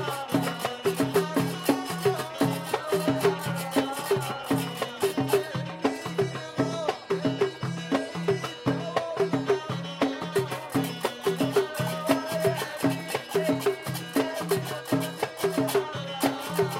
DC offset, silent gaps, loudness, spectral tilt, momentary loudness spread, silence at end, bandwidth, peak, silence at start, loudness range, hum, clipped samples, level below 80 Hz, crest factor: under 0.1%; none; -28 LUFS; -5 dB/octave; 4 LU; 0 s; 16.5 kHz; -8 dBFS; 0 s; 2 LU; none; under 0.1%; -66 dBFS; 20 dB